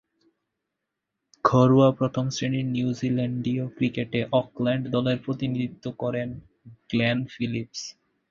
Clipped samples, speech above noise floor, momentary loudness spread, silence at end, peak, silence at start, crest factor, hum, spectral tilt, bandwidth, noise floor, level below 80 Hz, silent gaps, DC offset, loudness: under 0.1%; 59 dB; 12 LU; 0.4 s; -4 dBFS; 1.45 s; 20 dB; none; -6.5 dB/octave; 7.4 kHz; -83 dBFS; -58 dBFS; none; under 0.1%; -25 LUFS